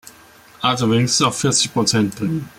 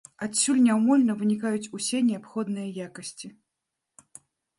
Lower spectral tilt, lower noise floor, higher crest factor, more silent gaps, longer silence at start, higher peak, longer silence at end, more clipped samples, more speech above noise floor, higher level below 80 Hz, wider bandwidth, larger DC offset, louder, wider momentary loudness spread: about the same, -3.5 dB/octave vs -4 dB/octave; second, -46 dBFS vs -84 dBFS; about the same, 16 dB vs 16 dB; neither; second, 0.05 s vs 0.2 s; first, -2 dBFS vs -10 dBFS; second, 0.1 s vs 1.3 s; neither; second, 28 dB vs 59 dB; first, -54 dBFS vs -74 dBFS; first, 16.5 kHz vs 11.5 kHz; neither; first, -17 LUFS vs -25 LUFS; second, 5 LU vs 17 LU